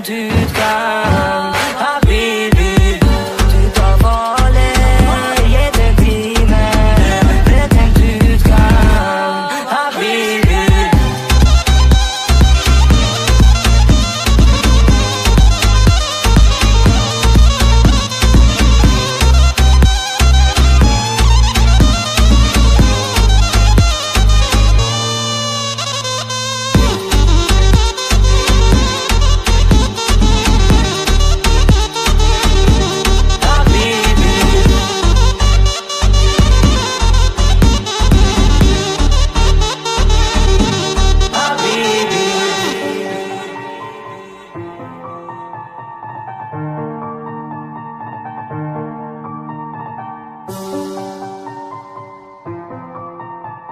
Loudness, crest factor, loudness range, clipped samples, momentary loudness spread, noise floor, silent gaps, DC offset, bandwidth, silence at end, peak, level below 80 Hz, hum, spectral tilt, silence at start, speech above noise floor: -12 LUFS; 10 dB; 16 LU; under 0.1%; 17 LU; -34 dBFS; none; under 0.1%; 15 kHz; 0 s; 0 dBFS; -12 dBFS; none; -4.5 dB/octave; 0 s; 20 dB